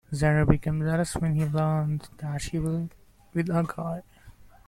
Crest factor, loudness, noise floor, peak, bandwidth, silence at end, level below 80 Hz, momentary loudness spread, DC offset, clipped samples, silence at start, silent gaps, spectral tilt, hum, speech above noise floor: 24 dB; -27 LUFS; -51 dBFS; -2 dBFS; 13 kHz; 0.35 s; -42 dBFS; 11 LU; under 0.1%; under 0.1%; 0.1 s; none; -7 dB/octave; none; 25 dB